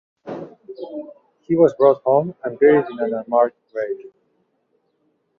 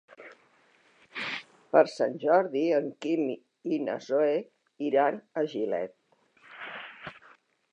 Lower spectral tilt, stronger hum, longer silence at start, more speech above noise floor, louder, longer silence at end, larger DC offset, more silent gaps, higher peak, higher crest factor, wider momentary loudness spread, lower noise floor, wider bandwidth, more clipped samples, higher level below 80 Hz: first, -9 dB/octave vs -6 dB/octave; neither; about the same, 0.25 s vs 0.2 s; first, 49 dB vs 37 dB; first, -18 LUFS vs -28 LUFS; first, 1.3 s vs 0.55 s; neither; neither; first, -2 dBFS vs -6 dBFS; second, 18 dB vs 24 dB; about the same, 20 LU vs 18 LU; about the same, -67 dBFS vs -64 dBFS; second, 6.4 kHz vs 9.6 kHz; neither; first, -64 dBFS vs -82 dBFS